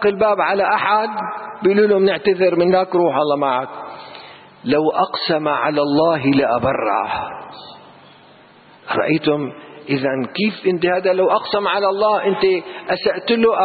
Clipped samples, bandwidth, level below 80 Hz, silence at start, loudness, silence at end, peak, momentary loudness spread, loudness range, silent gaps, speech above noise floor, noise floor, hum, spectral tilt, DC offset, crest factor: under 0.1%; 4.8 kHz; -56 dBFS; 0 s; -17 LUFS; 0 s; -4 dBFS; 14 LU; 6 LU; none; 29 dB; -46 dBFS; none; -11 dB/octave; under 0.1%; 14 dB